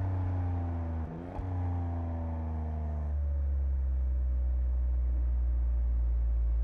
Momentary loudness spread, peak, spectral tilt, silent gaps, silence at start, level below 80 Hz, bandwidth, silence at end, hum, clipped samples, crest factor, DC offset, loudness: 4 LU; -24 dBFS; -11 dB/octave; none; 0 s; -32 dBFS; 2.6 kHz; 0 s; none; under 0.1%; 6 dB; under 0.1%; -33 LUFS